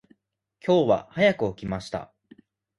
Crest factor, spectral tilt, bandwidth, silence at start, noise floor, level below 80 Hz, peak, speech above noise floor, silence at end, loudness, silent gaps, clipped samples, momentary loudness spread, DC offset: 18 dB; -6.5 dB/octave; 11.5 kHz; 0.65 s; -69 dBFS; -56 dBFS; -8 dBFS; 45 dB; 0.75 s; -24 LUFS; none; under 0.1%; 13 LU; under 0.1%